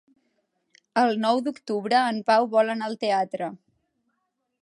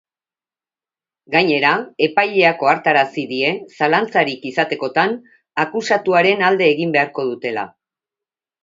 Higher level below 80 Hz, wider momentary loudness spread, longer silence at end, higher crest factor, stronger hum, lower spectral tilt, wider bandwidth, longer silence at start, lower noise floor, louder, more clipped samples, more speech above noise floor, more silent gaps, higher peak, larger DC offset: second, -80 dBFS vs -68 dBFS; about the same, 9 LU vs 8 LU; first, 1.1 s vs 0.95 s; about the same, 18 dB vs 18 dB; neither; about the same, -5 dB/octave vs -5 dB/octave; first, 11.5 kHz vs 7.8 kHz; second, 0.95 s vs 1.3 s; second, -77 dBFS vs under -90 dBFS; second, -24 LUFS vs -17 LUFS; neither; second, 54 dB vs over 73 dB; neither; second, -8 dBFS vs 0 dBFS; neither